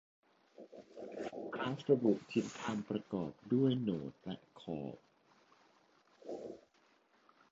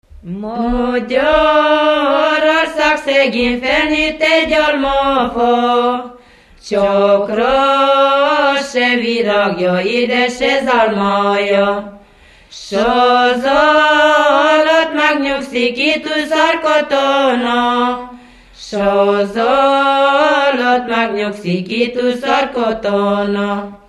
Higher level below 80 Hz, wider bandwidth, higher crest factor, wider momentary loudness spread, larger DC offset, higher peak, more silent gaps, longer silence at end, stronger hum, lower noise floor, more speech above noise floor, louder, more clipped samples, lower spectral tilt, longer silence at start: second, -76 dBFS vs -40 dBFS; second, 7.6 kHz vs 12 kHz; first, 22 dB vs 14 dB; first, 23 LU vs 7 LU; neither; second, -18 dBFS vs 0 dBFS; neither; first, 0.95 s vs 0.15 s; neither; first, -72 dBFS vs -44 dBFS; first, 35 dB vs 31 dB; second, -38 LUFS vs -13 LUFS; neither; first, -6.5 dB/octave vs -4.5 dB/octave; first, 0.6 s vs 0.25 s